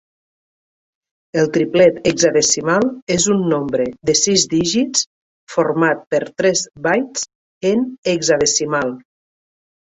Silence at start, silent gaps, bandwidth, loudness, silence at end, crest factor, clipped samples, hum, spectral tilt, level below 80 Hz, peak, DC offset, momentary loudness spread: 1.35 s; 3.02-3.07 s, 5.07-5.47 s, 6.07-6.11 s, 7.35-7.61 s, 7.98-8.03 s; 8.4 kHz; -17 LUFS; 0.85 s; 16 dB; under 0.1%; none; -3 dB/octave; -52 dBFS; -2 dBFS; under 0.1%; 9 LU